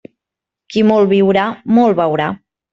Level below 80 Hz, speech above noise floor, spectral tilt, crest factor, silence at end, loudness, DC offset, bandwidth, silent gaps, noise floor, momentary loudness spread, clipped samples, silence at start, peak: -54 dBFS; 72 dB; -7.5 dB/octave; 12 dB; 0.4 s; -14 LUFS; under 0.1%; 7.4 kHz; none; -84 dBFS; 10 LU; under 0.1%; 0.7 s; -2 dBFS